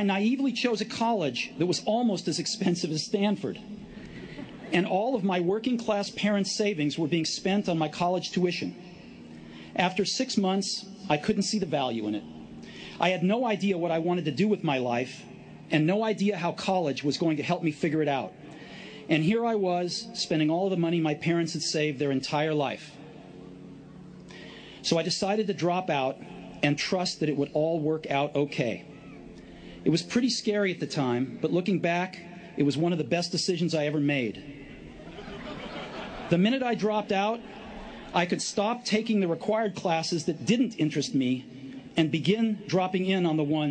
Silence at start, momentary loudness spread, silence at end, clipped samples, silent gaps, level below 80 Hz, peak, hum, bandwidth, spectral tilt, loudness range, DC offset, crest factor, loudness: 0 s; 18 LU; 0 s; under 0.1%; none; -62 dBFS; -8 dBFS; none; 9.8 kHz; -5 dB/octave; 3 LU; under 0.1%; 20 dB; -28 LUFS